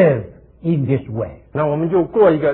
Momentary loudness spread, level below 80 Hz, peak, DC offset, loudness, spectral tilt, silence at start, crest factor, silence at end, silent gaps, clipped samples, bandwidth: 13 LU; -46 dBFS; 0 dBFS; under 0.1%; -18 LUFS; -13 dB/octave; 0 s; 16 dB; 0 s; none; under 0.1%; 4.2 kHz